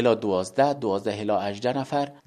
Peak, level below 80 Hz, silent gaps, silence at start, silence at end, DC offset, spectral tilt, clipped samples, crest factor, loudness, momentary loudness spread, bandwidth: -6 dBFS; -66 dBFS; none; 0 s; 0.15 s; under 0.1%; -6 dB/octave; under 0.1%; 18 dB; -25 LUFS; 5 LU; 12.5 kHz